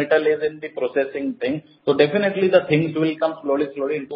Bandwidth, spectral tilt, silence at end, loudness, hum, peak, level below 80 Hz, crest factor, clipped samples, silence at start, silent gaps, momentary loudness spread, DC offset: 5.6 kHz; -11 dB/octave; 0 s; -21 LUFS; none; -2 dBFS; -62 dBFS; 18 dB; under 0.1%; 0 s; none; 9 LU; under 0.1%